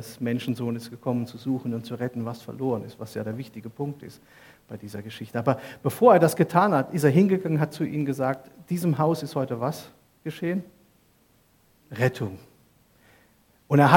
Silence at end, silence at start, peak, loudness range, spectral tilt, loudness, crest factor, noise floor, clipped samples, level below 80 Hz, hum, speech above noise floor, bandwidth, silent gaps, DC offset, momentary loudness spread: 0 s; 0 s; 0 dBFS; 11 LU; -7 dB/octave; -25 LUFS; 24 dB; -62 dBFS; under 0.1%; -68 dBFS; none; 37 dB; 17.5 kHz; none; under 0.1%; 17 LU